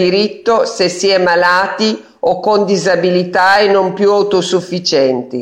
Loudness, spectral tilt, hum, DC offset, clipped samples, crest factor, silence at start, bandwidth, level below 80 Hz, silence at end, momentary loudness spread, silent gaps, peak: -12 LUFS; -4 dB/octave; none; under 0.1%; under 0.1%; 12 dB; 0 s; 11 kHz; -54 dBFS; 0 s; 5 LU; none; -2 dBFS